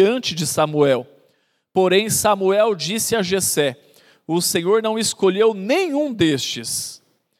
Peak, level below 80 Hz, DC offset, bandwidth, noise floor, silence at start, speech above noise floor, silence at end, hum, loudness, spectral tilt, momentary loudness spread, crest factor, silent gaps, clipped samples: -2 dBFS; -58 dBFS; under 0.1%; 16 kHz; -64 dBFS; 0 s; 45 dB; 0.45 s; none; -19 LUFS; -3.5 dB/octave; 7 LU; 16 dB; none; under 0.1%